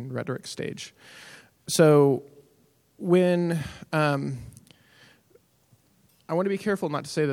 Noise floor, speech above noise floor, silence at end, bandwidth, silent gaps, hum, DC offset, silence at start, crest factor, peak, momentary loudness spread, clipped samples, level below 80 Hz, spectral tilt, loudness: -63 dBFS; 39 dB; 0 s; 17 kHz; none; none; under 0.1%; 0 s; 20 dB; -6 dBFS; 21 LU; under 0.1%; -62 dBFS; -6 dB/octave; -25 LUFS